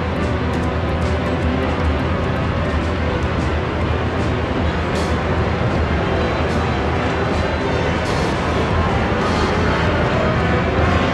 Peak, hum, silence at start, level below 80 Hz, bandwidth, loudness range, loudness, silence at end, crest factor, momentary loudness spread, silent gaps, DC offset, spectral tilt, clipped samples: -6 dBFS; none; 0 s; -26 dBFS; 10.5 kHz; 2 LU; -19 LUFS; 0 s; 12 dB; 3 LU; none; under 0.1%; -6.5 dB/octave; under 0.1%